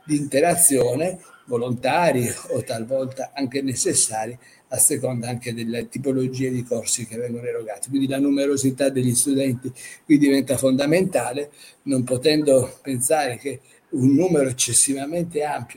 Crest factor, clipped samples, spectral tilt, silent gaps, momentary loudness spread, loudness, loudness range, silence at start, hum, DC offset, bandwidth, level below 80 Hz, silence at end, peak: 20 dB; under 0.1%; -4 dB/octave; none; 12 LU; -21 LUFS; 3 LU; 0.05 s; none; under 0.1%; 17 kHz; -60 dBFS; 0.05 s; -2 dBFS